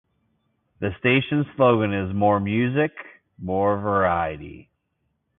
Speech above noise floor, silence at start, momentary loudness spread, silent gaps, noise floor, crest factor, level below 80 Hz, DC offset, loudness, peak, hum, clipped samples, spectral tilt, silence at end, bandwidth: 52 dB; 0.8 s; 13 LU; none; -74 dBFS; 18 dB; -48 dBFS; under 0.1%; -22 LUFS; -4 dBFS; none; under 0.1%; -11.5 dB/octave; 0.8 s; 3.9 kHz